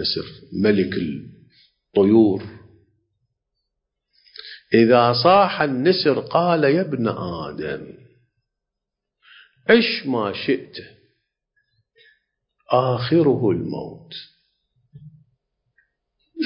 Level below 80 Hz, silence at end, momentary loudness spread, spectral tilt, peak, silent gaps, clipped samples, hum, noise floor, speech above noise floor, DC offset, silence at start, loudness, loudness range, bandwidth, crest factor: -56 dBFS; 0 s; 20 LU; -10.5 dB/octave; -2 dBFS; none; under 0.1%; none; -83 dBFS; 64 dB; under 0.1%; 0 s; -19 LUFS; 7 LU; 5.6 kHz; 20 dB